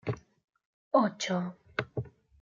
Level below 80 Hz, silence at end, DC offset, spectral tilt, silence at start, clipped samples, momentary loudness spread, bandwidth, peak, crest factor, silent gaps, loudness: -66 dBFS; 0.35 s; under 0.1%; -5.5 dB/octave; 0.05 s; under 0.1%; 14 LU; 7.4 kHz; -12 dBFS; 22 dB; 0.44-0.48 s, 0.65-0.91 s; -32 LUFS